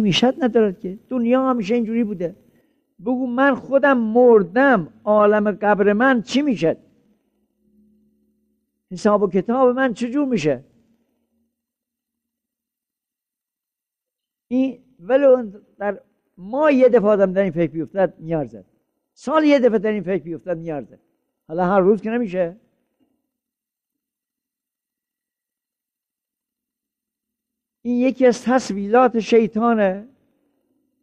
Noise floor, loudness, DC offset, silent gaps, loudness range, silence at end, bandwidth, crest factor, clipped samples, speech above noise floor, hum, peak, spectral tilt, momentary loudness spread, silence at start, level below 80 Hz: -87 dBFS; -18 LUFS; under 0.1%; none; 9 LU; 0.95 s; 9.2 kHz; 16 dB; under 0.1%; 69 dB; none; -4 dBFS; -6 dB/octave; 13 LU; 0 s; -60 dBFS